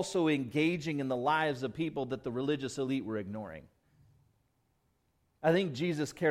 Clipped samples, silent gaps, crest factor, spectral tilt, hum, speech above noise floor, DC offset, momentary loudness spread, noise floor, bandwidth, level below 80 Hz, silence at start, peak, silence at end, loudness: under 0.1%; none; 18 dB; -6 dB/octave; none; 43 dB; under 0.1%; 9 LU; -75 dBFS; 14.5 kHz; -68 dBFS; 0 s; -16 dBFS; 0 s; -33 LUFS